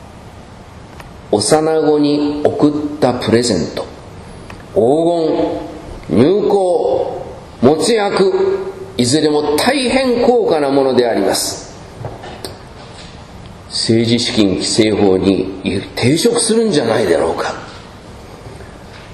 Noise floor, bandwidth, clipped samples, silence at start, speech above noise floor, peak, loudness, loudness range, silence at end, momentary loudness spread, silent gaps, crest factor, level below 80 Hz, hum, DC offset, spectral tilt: -35 dBFS; 14 kHz; under 0.1%; 0 s; 22 dB; 0 dBFS; -14 LUFS; 3 LU; 0 s; 22 LU; none; 16 dB; -42 dBFS; none; under 0.1%; -4.5 dB/octave